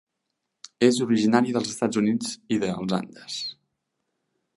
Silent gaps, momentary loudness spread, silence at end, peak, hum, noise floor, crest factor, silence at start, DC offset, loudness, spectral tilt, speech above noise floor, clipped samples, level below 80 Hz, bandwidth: none; 11 LU; 1.05 s; -4 dBFS; none; -80 dBFS; 22 dB; 0.8 s; under 0.1%; -24 LUFS; -5 dB/octave; 57 dB; under 0.1%; -66 dBFS; 11.5 kHz